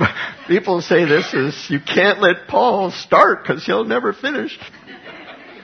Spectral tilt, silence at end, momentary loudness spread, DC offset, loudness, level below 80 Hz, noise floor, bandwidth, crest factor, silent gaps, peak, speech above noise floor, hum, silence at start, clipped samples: -5.5 dB/octave; 0 s; 23 LU; under 0.1%; -16 LUFS; -58 dBFS; -37 dBFS; 6.6 kHz; 18 dB; none; 0 dBFS; 21 dB; none; 0 s; under 0.1%